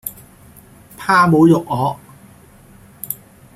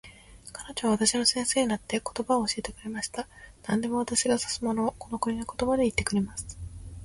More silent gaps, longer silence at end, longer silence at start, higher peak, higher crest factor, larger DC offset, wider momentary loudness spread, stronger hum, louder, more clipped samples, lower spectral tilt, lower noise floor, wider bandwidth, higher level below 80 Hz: neither; first, 0.4 s vs 0 s; about the same, 0.05 s vs 0.05 s; first, -2 dBFS vs -8 dBFS; about the same, 16 dB vs 20 dB; neither; first, 20 LU vs 17 LU; neither; first, -15 LUFS vs -28 LUFS; neither; first, -6.5 dB/octave vs -3 dB/octave; second, -45 dBFS vs -49 dBFS; first, 15.5 kHz vs 11.5 kHz; about the same, -52 dBFS vs -50 dBFS